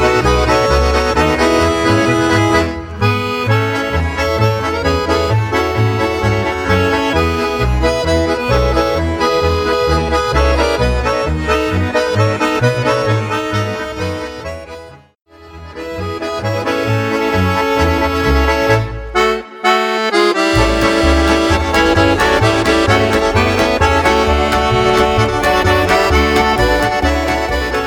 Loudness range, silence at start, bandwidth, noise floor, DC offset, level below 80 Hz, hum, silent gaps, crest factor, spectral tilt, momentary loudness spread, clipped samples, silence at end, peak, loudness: 6 LU; 0 s; 18.5 kHz; -35 dBFS; under 0.1%; -24 dBFS; none; none; 14 dB; -5.5 dB/octave; 6 LU; under 0.1%; 0 s; 0 dBFS; -14 LUFS